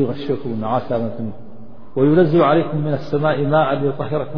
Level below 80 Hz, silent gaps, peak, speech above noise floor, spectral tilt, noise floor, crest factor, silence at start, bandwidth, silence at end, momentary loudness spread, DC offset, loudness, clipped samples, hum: -50 dBFS; none; -2 dBFS; 23 dB; -10 dB/octave; -41 dBFS; 16 dB; 0 s; 5.4 kHz; 0 s; 11 LU; 3%; -18 LUFS; under 0.1%; none